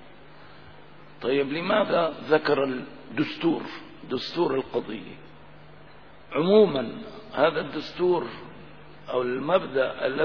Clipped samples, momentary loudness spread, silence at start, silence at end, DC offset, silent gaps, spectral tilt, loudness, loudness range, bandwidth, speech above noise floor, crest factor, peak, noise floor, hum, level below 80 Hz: under 0.1%; 17 LU; 0.4 s; 0 s; 0.4%; none; -7.5 dB/octave; -25 LUFS; 5 LU; 5.4 kHz; 25 dB; 20 dB; -6 dBFS; -50 dBFS; none; -62 dBFS